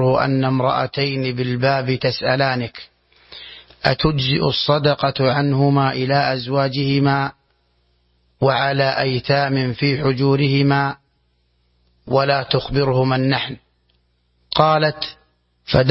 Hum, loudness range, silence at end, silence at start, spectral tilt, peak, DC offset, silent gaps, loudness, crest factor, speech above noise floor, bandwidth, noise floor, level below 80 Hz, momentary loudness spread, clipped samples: 60 Hz at -50 dBFS; 3 LU; 0 s; 0 s; -9.5 dB/octave; 0 dBFS; under 0.1%; none; -18 LUFS; 18 dB; 46 dB; 5.8 kHz; -63 dBFS; -46 dBFS; 9 LU; under 0.1%